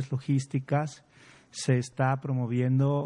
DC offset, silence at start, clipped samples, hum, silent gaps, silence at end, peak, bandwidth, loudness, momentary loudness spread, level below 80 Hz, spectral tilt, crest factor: under 0.1%; 0 s; under 0.1%; none; none; 0 s; -12 dBFS; 11 kHz; -29 LUFS; 7 LU; -70 dBFS; -7 dB/octave; 16 dB